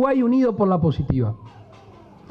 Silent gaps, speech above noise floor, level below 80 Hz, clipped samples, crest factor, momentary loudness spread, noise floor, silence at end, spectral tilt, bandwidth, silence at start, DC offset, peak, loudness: none; 26 dB; -42 dBFS; under 0.1%; 14 dB; 8 LU; -46 dBFS; 0.4 s; -10 dB/octave; 6 kHz; 0 s; under 0.1%; -6 dBFS; -20 LUFS